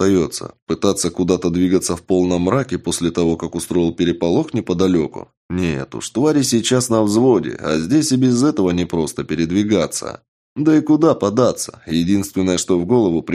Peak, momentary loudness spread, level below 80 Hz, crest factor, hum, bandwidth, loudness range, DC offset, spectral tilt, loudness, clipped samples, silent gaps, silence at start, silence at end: 0 dBFS; 8 LU; -46 dBFS; 16 dB; none; 15.5 kHz; 3 LU; under 0.1%; -5.5 dB/octave; -17 LUFS; under 0.1%; 0.62-0.67 s, 5.37-5.49 s, 10.28-10.56 s; 0 s; 0 s